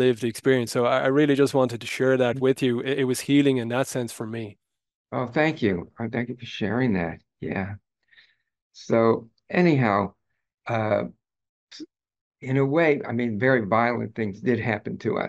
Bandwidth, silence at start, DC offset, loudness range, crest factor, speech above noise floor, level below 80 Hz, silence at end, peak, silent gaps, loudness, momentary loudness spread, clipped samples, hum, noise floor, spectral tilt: 12.5 kHz; 0 s; under 0.1%; 5 LU; 18 dB; 36 dB; -64 dBFS; 0 s; -6 dBFS; 4.95-5.05 s, 8.62-8.70 s, 10.54-10.58 s, 11.49-11.67 s, 12.21-12.31 s; -24 LUFS; 12 LU; under 0.1%; none; -59 dBFS; -6 dB/octave